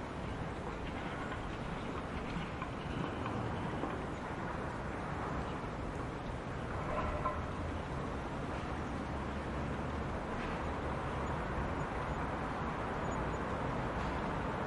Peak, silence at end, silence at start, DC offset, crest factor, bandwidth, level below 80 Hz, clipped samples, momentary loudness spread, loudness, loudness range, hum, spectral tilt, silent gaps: -22 dBFS; 0 s; 0 s; under 0.1%; 16 dB; 11.5 kHz; -48 dBFS; under 0.1%; 4 LU; -39 LUFS; 2 LU; none; -6.5 dB/octave; none